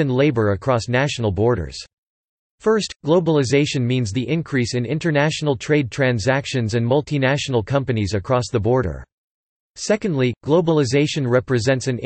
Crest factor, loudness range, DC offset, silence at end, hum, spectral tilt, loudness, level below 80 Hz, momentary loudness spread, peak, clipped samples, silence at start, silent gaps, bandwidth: 14 dB; 2 LU; under 0.1%; 0 s; none; -6 dB/octave; -19 LUFS; -48 dBFS; 5 LU; -4 dBFS; under 0.1%; 0 s; 1.93-2.58 s, 2.96-3.00 s, 9.12-9.74 s; 8.8 kHz